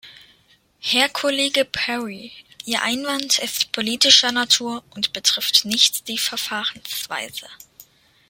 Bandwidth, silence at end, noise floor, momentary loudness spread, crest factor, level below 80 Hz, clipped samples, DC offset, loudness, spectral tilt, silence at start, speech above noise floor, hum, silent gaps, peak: 17 kHz; 0.45 s; -58 dBFS; 15 LU; 22 dB; -64 dBFS; under 0.1%; under 0.1%; -18 LUFS; -0.5 dB/octave; 0.05 s; 37 dB; none; none; 0 dBFS